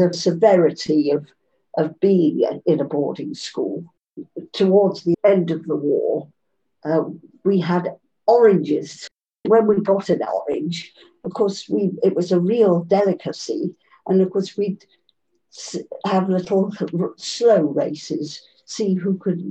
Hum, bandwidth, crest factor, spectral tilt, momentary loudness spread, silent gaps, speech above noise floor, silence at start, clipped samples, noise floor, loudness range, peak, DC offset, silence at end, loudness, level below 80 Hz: none; 8.6 kHz; 16 dB; -6.5 dB/octave; 16 LU; none; 48 dB; 0 s; under 0.1%; -67 dBFS; 4 LU; -2 dBFS; under 0.1%; 0 s; -20 LUFS; -68 dBFS